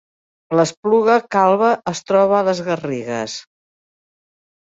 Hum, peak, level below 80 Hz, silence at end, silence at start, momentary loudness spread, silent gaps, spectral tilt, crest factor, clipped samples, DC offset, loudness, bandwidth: none; -2 dBFS; -62 dBFS; 1.25 s; 0.5 s; 10 LU; 0.77-0.83 s; -5 dB/octave; 16 dB; under 0.1%; under 0.1%; -17 LUFS; 8 kHz